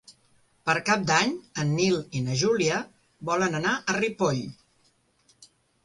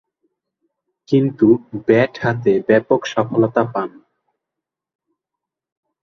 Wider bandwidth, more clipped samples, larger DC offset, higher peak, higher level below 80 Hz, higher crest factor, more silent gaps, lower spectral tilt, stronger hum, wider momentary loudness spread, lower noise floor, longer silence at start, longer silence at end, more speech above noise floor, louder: first, 11.5 kHz vs 7 kHz; neither; neither; second, -8 dBFS vs 0 dBFS; about the same, -62 dBFS vs -58 dBFS; about the same, 20 dB vs 18 dB; neither; second, -4.5 dB/octave vs -7.5 dB/octave; neither; first, 9 LU vs 5 LU; second, -66 dBFS vs -84 dBFS; second, 0.1 s vs 1.1 s; second, 0.4 s vs 2.15 s; second, 41 dB vs 68 dB; second, -25 LUFS vs -17 LUFS